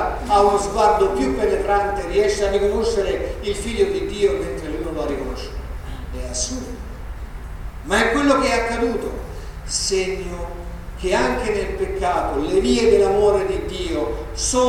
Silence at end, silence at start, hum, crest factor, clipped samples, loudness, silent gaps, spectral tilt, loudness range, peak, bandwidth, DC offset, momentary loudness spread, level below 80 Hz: 0 s; 0 s; none; 18 dB; under 0.1%; -20 LUFS; none; -4 dB/octave; 6 LU; -4 dBFS; 15.5 kHz; under 0.1%; 17 LU; -32 dBFS